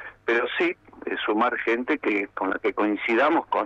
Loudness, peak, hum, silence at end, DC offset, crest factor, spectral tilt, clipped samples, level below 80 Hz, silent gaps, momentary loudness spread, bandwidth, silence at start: -24 LUFS; -10 dBFS; none; 0 s; under 0.1%; 16 dB; -5.5 dB/octave; under 0.1%; -64 dBFS; none; 6 LU; 7.4 kHz; 0 s